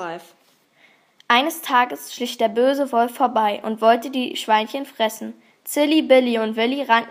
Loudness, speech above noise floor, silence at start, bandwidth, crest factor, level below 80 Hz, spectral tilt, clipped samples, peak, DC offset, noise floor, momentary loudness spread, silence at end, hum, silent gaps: -20 LUFS; 37 dB; 0 s; 15.5 kHz; 20 dB; -80 dBFS; -3 dB/octave; under 0.1%; 0 dBFS; under 0.1%; -56 dBFS; 12 LU; 0 s; none; none